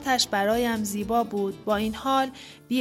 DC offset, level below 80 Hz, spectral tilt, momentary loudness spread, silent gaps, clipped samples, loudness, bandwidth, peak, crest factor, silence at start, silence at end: under 0.1%; -52 dBFS; -3.5 dB/octave; 6 LU; none; under 0.1%; -26 LUFS; 16.5 kHz; -10 dBFS; 16 dB; 0 s; 0 s